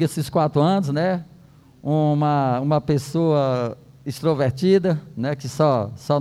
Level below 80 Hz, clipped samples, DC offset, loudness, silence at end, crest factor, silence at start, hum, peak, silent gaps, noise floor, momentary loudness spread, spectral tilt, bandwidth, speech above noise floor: -56 dBFS; under 0.1%; under 0.1%; -21 LUFS; 0 s; 14 dB; 0 s; none; -6 dBFS; none; -49 dBFS; 8 LU; -7.5 dB/octave; 13.5 kHz; 29 dB